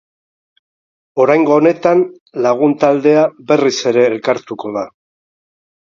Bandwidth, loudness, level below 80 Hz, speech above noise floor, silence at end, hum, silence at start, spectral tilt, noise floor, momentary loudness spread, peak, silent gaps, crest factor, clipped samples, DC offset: 7.4 kHz; -14 LUFS; -62 dBFS; over 77 dB; 1.05 s; none; 1.15 s; -5.5 dB/octave; under -90 dBFS; 12 LU; 0 dBFS; 2.21-2.26 s; 14 dB; under 0.1%; under 0.1%